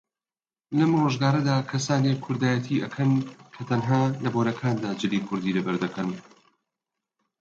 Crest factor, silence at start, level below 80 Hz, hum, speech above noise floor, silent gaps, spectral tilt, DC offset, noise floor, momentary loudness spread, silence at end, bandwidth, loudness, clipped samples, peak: 18 dB; 0.7 s; -66 dBFS; none; over 66 dB; none; -6.5 dB/octave; under 0.1%; under -90 dBFS; 7 LU; 1.2 s; 7.8 kHz; -25 LUFS; under 0.1%; -8 dBFS